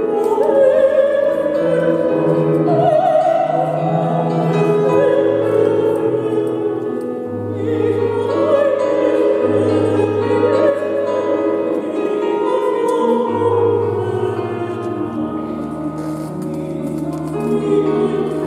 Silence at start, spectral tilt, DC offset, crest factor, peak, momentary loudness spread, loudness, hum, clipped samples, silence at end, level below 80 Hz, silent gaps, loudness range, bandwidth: 0 s; -8 dB/octave; under 0.1%; 14 dB; -2 dBFS; 9 LU; -17 LUFS; none; under 0.1%; 0 s; -56 dBFS; none; 6 LU; 12.5 kHz